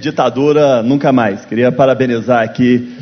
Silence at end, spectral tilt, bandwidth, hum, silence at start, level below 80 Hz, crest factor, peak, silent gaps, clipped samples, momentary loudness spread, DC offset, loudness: 0 s; -7 dB/octave; 6.6 kHz; none; 0 s; -50 dBFS; 12 dB; 0 dBFS; none; under 0.1%; 4 LU; under 0.1%; -12 LUFS